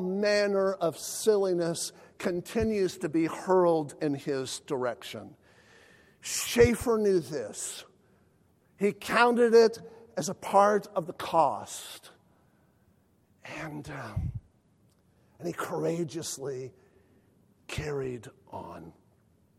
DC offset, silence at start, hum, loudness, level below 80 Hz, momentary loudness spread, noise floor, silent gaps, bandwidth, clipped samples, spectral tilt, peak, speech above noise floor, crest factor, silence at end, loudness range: under 0.1%; 0 s; none; -28 LUFS; -54 dBFS; 19 LU; -66 dBFS; none; 16 kHz; under 0.1%; -4.5 dB/octave; -8 dBFS; 38 dB; 22 dB; 0.7 s; 13 LU